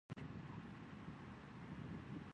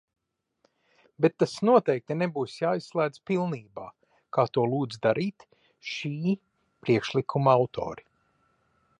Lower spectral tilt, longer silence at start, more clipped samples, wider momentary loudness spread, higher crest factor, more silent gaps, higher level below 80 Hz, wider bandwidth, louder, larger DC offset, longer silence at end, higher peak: about the same, -7.5 dB/octave vs -7 dB/octave; second, 0.1 s vs 1.2 s; neither; second, 4 LU vs 14 LU; about the same, 18 dB vs 20 dB; neither; about the same, -68 dBFS vs -68 dBFS; about the same, 10 kHz vs 11 kHz; second, -53 LUFS vs -27 LUFS; neither; second, 0 s vs 1 s; second, -36 dBFS vs -8 dBFS